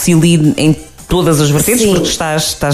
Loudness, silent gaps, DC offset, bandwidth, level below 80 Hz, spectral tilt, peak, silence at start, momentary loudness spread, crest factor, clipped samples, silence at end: -11 LUFS; none; under 0.1%; 15.5 kHz; -32 dBFS; -5 dB/octave; 0 dBFS; 0 s; 5 LU; 10 dB; under 0.1%; 0 s